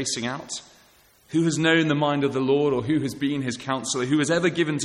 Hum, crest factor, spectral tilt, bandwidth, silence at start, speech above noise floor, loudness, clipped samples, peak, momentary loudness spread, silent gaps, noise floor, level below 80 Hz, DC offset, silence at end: none; 16 dB; -4.5 dB/octave; 14 kHz; 0 s; 34 dB; -23 LUFS; under 0.1%; -8 dBFS; 8 LU; none; -57 dBFS; -60 dBFS; under 0.1%; 0 s